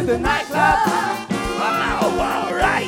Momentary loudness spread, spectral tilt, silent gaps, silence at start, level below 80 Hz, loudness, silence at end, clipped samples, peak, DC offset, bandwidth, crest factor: 6 LU; -4.5 dB/octave; none; 0 s; -36 dBFS; -19 LUFS; 0 s; under 0.1%; -2 dBFS; under 0.1%; 19 kHz; 16 dB